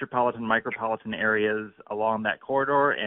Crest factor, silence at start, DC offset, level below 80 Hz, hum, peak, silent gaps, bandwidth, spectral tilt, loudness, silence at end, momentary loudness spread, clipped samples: 18 dB; 0 s; under 0.1%; -66 dBFS; none; -8 dBFS; none; 4 kHz; -2.5 dB/octave; -26 LUFS; 0 s; 7 LU; under 0.1%